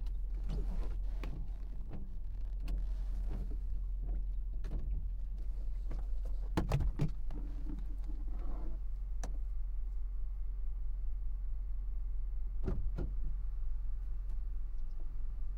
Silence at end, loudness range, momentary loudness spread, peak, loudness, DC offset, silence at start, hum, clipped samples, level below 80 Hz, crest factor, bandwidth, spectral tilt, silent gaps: 0 s; 3 LU; 6 LU; -20 dBFS; -43 LUFS; under 0.1%; 0 s; none; under 0.1%; -36 dBFS; 16 dB; 6.6 kHz; -7.5 dB/octave; none